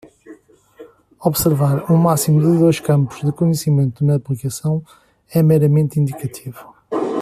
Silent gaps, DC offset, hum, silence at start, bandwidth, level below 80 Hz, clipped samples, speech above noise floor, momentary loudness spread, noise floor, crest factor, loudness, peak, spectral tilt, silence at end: none; under 0.1%; none; 0.25 s; 15 kHz; -50 dBFS; under 0.1%; 29 dB; 10 LU; -44 dBFS; 16 dB; -17 LUFS; -2 dBFS; -7 dB/octave; 0 s